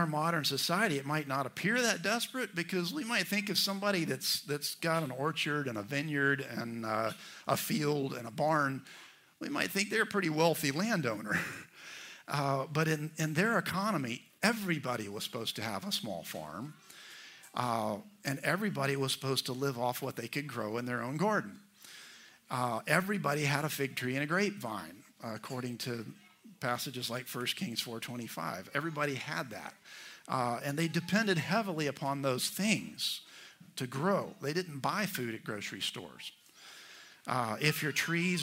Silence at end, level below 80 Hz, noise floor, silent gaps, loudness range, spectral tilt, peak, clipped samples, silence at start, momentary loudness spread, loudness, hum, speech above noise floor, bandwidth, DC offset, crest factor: 0 s; -78 dBFS; -55 dBFS; none; 5 LU; -4 dB/octave; -10 dBFS; under 0.1%; 0 s; 16 LU; -34 LUFS; none; 22 dB; 16 kHz; under 0.1%; 24 dB